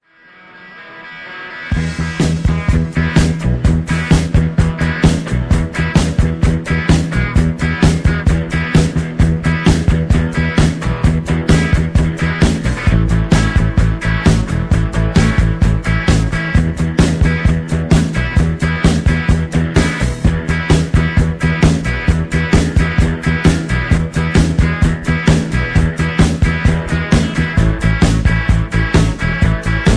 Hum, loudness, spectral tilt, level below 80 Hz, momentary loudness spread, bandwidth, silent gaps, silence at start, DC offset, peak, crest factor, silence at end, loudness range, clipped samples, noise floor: none; -14 LUFS; -6.5 dB/octave; -18 dBFS; 3 LU; 11 kHz; none; 0.55 s; under 0.1%; 0 dBFS; 14 dB; 0 s; 1 LU; under 0.1%; -43 dBFS